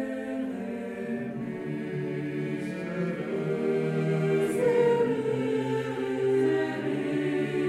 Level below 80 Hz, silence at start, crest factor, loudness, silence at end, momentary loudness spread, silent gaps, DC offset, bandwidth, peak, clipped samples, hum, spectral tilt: -68 dBFS; 0 s; 16 dB; -29 LUFS; 0 s; 9 LU; none; under 0.1%; 13 kHz; -12 dBFS; under 0.1%; none; -7.5 dB/octave